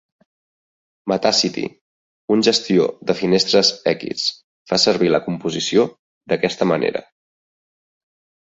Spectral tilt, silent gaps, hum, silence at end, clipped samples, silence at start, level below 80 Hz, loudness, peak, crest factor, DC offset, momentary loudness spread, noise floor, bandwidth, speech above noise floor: -4 dB/octave; 1.81-2.28 s, 4.44-4.66 s, 5.99-6.21 s; none; 1.45 s; under 0.1%; 1.05 s; -60 dBFS; -18 LUFS; -2 dBFS; 18 dB; under 0.1%; 9 LU; under -90 dBFS; 8 kHz; over 72 dB